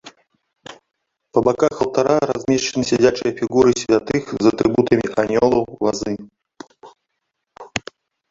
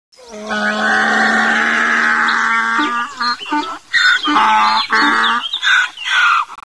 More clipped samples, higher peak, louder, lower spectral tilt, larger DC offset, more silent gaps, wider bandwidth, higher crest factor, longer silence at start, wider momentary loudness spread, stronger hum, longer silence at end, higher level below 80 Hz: neither; about the same, -2 dBFS vs -2 dBFS; second, -18 LUFS vs -13 LUFS; first, -5 dB/octave vs -1.5 dB/octave; second, under 0.1% vs 0.3%; neither; second, 7.8 kHz vs 11 kHz; about the same, 18 dB vs 14 dB; second, 0.05 s vs 0.2 s; first, 10 LU vs 7 LU; neither; first, 0.5 s vs 0.1 s; first, -52 dBFS vs -58 dBFS